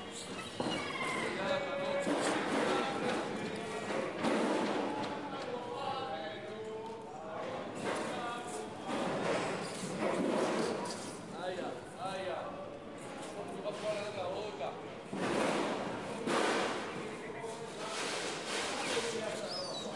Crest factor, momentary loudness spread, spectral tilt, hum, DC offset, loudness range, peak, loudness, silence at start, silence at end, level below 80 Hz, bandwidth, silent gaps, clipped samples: 18 dB; 10 LU; -4 dB/octave; none; under 0.1%; 6 LU; -18 dBFS; -37 LUFS; 0 s; 0 s; -72 dBFS; 11.5 kHz; none; under 0.1%